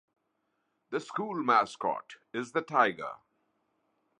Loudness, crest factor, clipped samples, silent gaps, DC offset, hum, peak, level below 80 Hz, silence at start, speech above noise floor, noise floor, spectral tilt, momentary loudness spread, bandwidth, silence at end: -30 LUFS; 24 dB; under 0.1%; none; under 0.1%; none; -10 dBFS; -80 dBFS; 0.9 s; 48 dB; -79 dBFS; -5 dB/octave; 14 LU; 10.5 kHz; 1.05 s